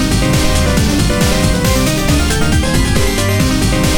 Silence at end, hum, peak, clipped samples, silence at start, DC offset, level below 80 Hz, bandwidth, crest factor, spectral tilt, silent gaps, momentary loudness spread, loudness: 0 s; none; 0 dBFS; under 0.1%; 0 s; 3%; -18 dBFS; 20 kHz; 12 dB; -4.5 dB/octave; none; 1 LU; -13 LUFS